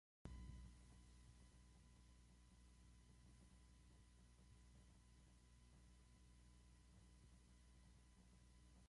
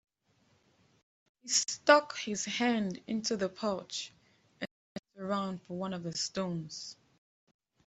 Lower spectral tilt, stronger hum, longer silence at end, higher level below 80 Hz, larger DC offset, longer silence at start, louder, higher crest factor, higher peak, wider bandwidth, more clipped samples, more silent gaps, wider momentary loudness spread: first, -5 dB/octave vs -3 dB/octave; first, 60 Hz at -70 dBFS vs none; second, 0 s vs 0.95 s; first, -68 dBFS vs -74 dBFS; neither; second, 0.25 s vs 1.45 s; second, -64 LUFS vs -32 LUFS; about the same, 26 dB vs 28 dB; second, -40 dBFS vs -8 dBFS; first, 11 kHz vs 8.2 kHz; neither; second, none vs 4.71-5.03 s; second, 9 LU vs 19 LU